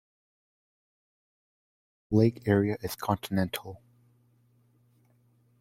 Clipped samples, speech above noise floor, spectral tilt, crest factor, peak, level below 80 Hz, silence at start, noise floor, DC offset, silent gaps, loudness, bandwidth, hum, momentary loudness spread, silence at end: under 0.1%; 39 dB; -7 dB/octave; 22 dB; -10 dBFS; -62 dBFS; 2.1 s; -66 dBFS; under 0.1%; none; -28 LUFS; 16.5 kHz; none; 10 LU; 1.85 s